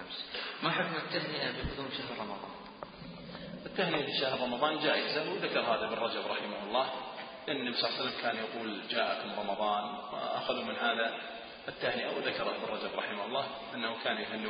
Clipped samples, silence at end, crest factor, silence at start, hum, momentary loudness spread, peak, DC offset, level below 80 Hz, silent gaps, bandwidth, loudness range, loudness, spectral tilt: under 0.1%; 0 s; 22 dB; 0 s; none; 12 LU; -14 dBFS; under 0.1%; -62 dBFS; none; 5 kHz; 4 LU; -34 LUFS; -1.5 dB/octave